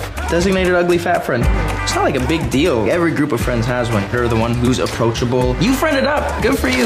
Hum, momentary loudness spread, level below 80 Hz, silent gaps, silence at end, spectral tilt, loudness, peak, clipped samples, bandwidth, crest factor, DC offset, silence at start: none; 3 LU; -26 dBFS; none; 0 s; -5.5 dB/octave; -16 LUFS; -4 dBFS; under 0.1%; 15.5 kHz; 12 dB; under 0.1%; 0 s